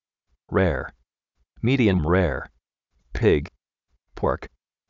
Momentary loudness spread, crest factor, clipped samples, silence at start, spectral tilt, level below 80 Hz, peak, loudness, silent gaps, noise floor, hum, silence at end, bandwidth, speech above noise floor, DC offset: 18 LU; 18 dB; under 0.1%; 0.5 s; -6.5 dB/octave; -38 dBFS; -8 dBFS; -23 LUFS; none; -73 dBFS; none; 0.45 s; 7.2 kHz; 52 dB; under 0.1%